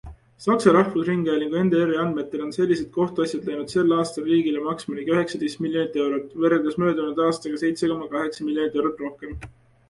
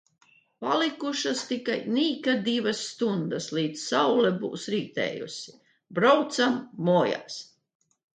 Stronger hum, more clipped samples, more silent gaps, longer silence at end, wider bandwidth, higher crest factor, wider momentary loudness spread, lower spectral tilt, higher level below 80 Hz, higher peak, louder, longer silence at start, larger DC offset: neither; neither; neither; second, 0.4 s vs 0.75 s; first, 11.5 kHz vs 9.4 kHz; about the same, 20 dB vs 20 dB; second, 8 LU vs 13 LU; first, -6.5 dB/octave vs -4.5 dB/octave; first, -52 dBFS vs -76 dBFS; first, -2 dBFS vs -8 dBFS; first, -23 LUFS vs -26 LUFS; second, 0.05 s vs 0.6 s; neither